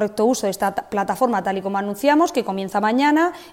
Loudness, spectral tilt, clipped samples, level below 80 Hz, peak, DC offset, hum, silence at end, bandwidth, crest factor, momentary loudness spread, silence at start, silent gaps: -20 LUFS; -4.5 dB/octave; under 0.1%; -58 dBFS; -4 dBFS; under 0.1%; none; 0 s; 16.5 kHz; 16 dB; 7 LU; 0 s; none